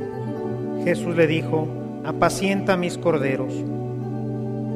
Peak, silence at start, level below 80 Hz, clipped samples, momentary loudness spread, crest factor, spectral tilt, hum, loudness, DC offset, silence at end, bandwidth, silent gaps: -4 dBFS; 0 s; -52 dBFS; under 0.1%; 9 LU; 20 dB; -6.5 dB/octave; none; -23 LUFS; under 0.1%; 0 s; 14.5 kHz; none